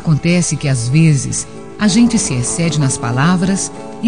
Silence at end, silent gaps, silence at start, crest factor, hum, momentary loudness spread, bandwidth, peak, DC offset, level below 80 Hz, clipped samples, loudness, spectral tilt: 0 s; none; 0 s; 12 dB; none; 8 LU; 10 kHz; -2 dBFS; 1%; -40 dBFS; under 0.1%; -14 LUFS; -5 dB/octave